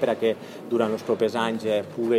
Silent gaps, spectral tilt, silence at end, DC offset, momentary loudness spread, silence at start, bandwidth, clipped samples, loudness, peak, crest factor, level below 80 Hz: none; -6 dB/octave; 0 s; under 0.1%; 3 LU; 0 s; 15.5 kHz; under 0.1%; -25 LUFS; -8 dBFS; 16 dB; -76 dBFS